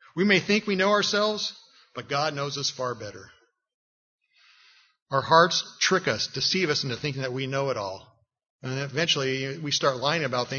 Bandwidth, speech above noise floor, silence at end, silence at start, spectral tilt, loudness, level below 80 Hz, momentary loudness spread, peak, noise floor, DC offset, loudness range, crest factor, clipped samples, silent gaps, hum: 7.2 kHz; 34 dB; 0 s; 0.15 s; -3.5 dB/octave; -25 LUFS; -68 dBFS; 12 LU; -4 dBFS; -59 dBFS; under 0.1%; 8 LU; 24 dB; under 0.1%; 3.74-4.18 s, 5.02-5.06 s, 8.50-8.59 s; none